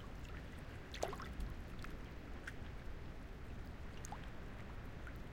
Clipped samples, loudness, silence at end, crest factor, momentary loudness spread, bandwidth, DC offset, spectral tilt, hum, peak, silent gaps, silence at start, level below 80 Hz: under 0.1%; -51 LUFS; 0 s; 24 dB; 7 LU; 16.5 kHz; under 0.1%; -5 dB/octave; none; -24 dBFS; none; 0 s; -52 dBFS